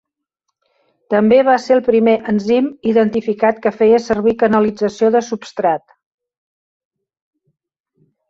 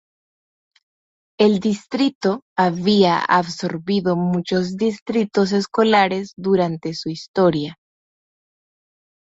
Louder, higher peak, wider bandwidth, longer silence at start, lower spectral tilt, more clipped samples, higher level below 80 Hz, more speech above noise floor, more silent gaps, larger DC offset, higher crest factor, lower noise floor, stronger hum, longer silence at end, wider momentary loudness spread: first, -15 LUFS vs -19 LUFS; about the same, -2 dBFS vs -2 dBFS; about the same, 7.8 kHz vs 8 kHz; second, 1.1 s vs 1.4 s; about the same, -6.5 dB/octave vs -6 dB/octave; neither; first, -54 dBFS vs -60 dBFS; second, 62 dB vs over 71 dB; second, none vs 2.15-2.21 s, 2.42-2.56 s, 5.02-5.06 s, 7.28-7.34 s; neither; about the same, 14 dB vs 18 dB; second, -76 dBFS vs under -90 dBFS; neither; first, 2.5 s vs 1.65 s; second, 6 LU vs 10 LU